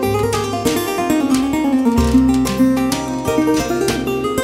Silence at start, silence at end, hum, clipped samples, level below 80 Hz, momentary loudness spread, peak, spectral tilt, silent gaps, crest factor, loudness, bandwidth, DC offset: 0 s; 0 s; none; under 0.1%; -30 dBFS; 5 LU; -2 dBFS; -5 dB/octave; none; 14 dB; -16 LUFS; 16 kHz; under 0.1%